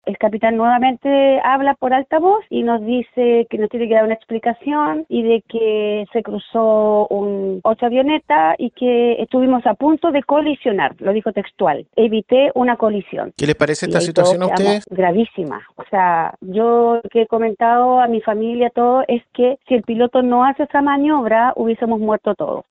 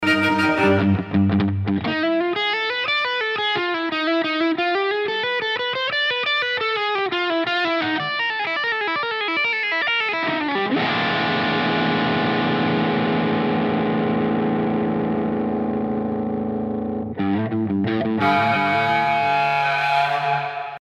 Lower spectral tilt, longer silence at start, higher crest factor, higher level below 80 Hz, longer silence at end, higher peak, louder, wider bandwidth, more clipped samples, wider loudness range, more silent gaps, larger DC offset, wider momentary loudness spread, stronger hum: about the same, -6 dB/octave vs -6.5 dB/octave; about the same, 0.05 s vs 0 s; about the same, 16 dB vs 16 dB; about the same, -56 dBFS vs -56 dBFS; about the same, 0.1 s vs 0 s; first, 0 dBFS vs -6 dBFS; first, -16 LUFS vs -20 LUFS; second, 10.5 kHz vs 12 kHz; neither; about the same, 2 LU vs 3 LU; neither; neither; about the same, 6 LU vs 4 LU; neither